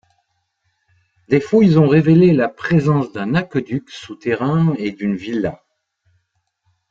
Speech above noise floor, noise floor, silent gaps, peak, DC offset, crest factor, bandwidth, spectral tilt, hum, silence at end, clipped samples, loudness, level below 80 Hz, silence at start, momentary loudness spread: 54 dB; -69 dBFS; none; -2 dBFS; under 0.1%; 16 dB; 7.4 kHz; -8.5 dB/octave; none; 1.35 s; under 0.1%; -16 LUFS; -54 dBFS; 1.3 s; 13 LU